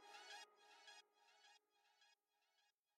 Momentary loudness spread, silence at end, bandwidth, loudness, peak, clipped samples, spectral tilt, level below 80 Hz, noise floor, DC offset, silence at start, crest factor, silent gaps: 8 LU; 0.25 s; 13 kHz; -62 LUFS; -46 dBFS; under 0.1%; 2.5 dB/octave; under -90 dBFS; -86 dBFS; under 0.1%; 0 s; 22 dB; none